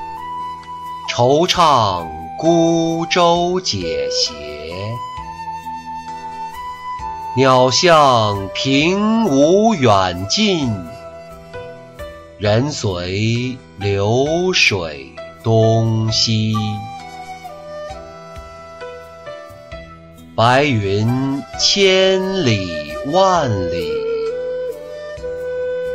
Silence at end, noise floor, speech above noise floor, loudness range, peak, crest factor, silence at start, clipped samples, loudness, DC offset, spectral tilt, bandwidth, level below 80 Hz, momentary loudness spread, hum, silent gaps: 0 s; -39 dBFS; 24 dB; 9 LU; -2 dBFS; 16 dB; 0 s; under 0.1%; -16 LUFS; 0.1%; -4.5 dB/octave; 14 kHz; -44 dBFS; 21 LU; none; none